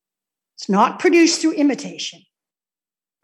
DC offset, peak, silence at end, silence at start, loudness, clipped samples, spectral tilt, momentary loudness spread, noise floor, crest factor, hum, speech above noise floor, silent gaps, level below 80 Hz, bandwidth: under 0.1%; -2 dBFS; 1.1 s; 0.6 s; -17 LUFS; under 0.1%; -4 dB/octave; 15 LU; under -90 dBFS; 18 dB; none; over 73 dB; none; -78 dBFS; 11.5 kHz